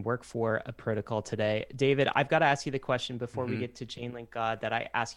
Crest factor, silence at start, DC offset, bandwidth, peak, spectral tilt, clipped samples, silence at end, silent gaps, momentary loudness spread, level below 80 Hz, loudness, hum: 20 dB; 0 s; under 0.1%; 12 kHz; -10 dBFS; -5.5 dB/octave; under 0.1%; 0 s; none; 11 LU; -62 dBFS; -31 LUFS; none